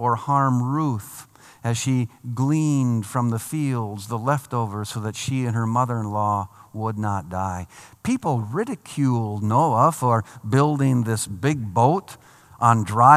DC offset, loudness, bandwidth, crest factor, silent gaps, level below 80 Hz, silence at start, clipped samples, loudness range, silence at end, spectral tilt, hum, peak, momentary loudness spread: under 0.1%; -23 LUFS; 15 kHz; 22 dB; none; -62 dBFS; 0 s; under 0.1%; 5 LU; 0 s; -6.5 dB/octave; none; 0 dBFS; 10 LU